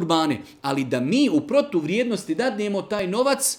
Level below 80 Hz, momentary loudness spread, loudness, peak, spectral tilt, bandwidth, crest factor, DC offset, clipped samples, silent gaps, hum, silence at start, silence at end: -64 dBFS; 6 LU; -23 LUFS; -4 dBFS; -4 dB/octave; 18.5 kHz; 18 dB; under 0.1%; under 0.1%; none; none; 0 s; 0 s